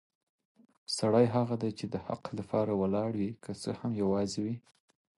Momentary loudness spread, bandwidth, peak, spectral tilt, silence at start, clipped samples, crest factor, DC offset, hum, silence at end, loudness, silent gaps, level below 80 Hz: 12 LU; 11.5 kHz; -14 dBFS; -6.5 dB/octave; 0.9 s; under 0.1%; 20 dB; under 0.1%; none; 0.6 s; -32 LUFS; none; -62 dBFS